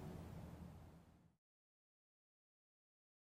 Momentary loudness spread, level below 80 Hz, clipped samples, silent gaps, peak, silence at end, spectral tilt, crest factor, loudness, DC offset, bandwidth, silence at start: 10 LU; -70 dBFS; under 0.1%; none; -42 dBFS; 2 s; -7.5 dB/octave; 18 dB; -57 LUFS; under 0.1%; 16 kHz; 0 s